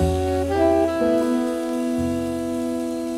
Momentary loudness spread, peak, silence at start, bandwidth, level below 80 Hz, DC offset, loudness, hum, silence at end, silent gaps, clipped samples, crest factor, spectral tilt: 7 LU; -8 dBFS; 0 s; 15.5 kHz; -38 dBFS; under 0.1%; -22 LUFS; none; 0 s; none; under 0.1%; 14 dB; -6.5 dB/octave